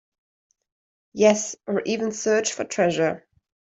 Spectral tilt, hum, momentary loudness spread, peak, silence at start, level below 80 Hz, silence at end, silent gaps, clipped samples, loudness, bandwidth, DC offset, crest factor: -4 dB/octave; none; 8 LU; -4 dBFS; 1.15 s; -68 dBFS; 0.5 s; none; under 0.1%; -23 LUFS; 8.2 kHz; under 0.1%; 20 dB